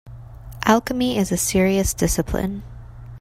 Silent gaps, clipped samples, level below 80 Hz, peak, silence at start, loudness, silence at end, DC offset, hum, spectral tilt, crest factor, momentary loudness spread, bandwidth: none; under 0.1%; -36 dBFS; 0 dBFS; 0.05 s; -20 LUFS; 0 s; under 0.1%; none; -4.5 dB/octave; 22 dB; 22 LU; 16 kHz